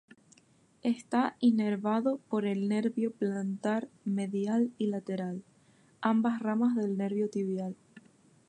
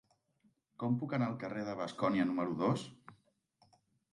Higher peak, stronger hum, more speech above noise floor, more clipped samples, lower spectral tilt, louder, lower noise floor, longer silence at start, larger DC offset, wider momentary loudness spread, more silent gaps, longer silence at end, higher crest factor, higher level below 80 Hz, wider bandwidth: first, -14 dBFS vs -20 dBFS; neither; second, 34 dB vs 39 dB; neither; about the same, -7.5 dB/octave vs -7.5 dB/octave; first, -31 LUFS vs -36 LUFS; second, -65 dBFS vs -75 dBFS; about the same, 0.85 s vs 0.8 s; neither; about the same, 8 LU vs 7 LU; neither; second, 0.5 s vs 1 s; about the same, 18 dB vs 18 dB; second, -82 dBFS vs -76 dBFS; second, 9.8 kHz vs 11 kHz